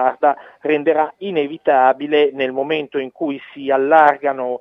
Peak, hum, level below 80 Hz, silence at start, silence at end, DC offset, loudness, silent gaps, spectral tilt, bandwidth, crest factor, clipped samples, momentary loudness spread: 0 dBFS; none; -70 dBFS; 0 s; 0.05 s; under 0.1%; -17 LUFS; none; -7 dB/octave; 5.6 kHz; 16 dB; under 0.1%; 12 LU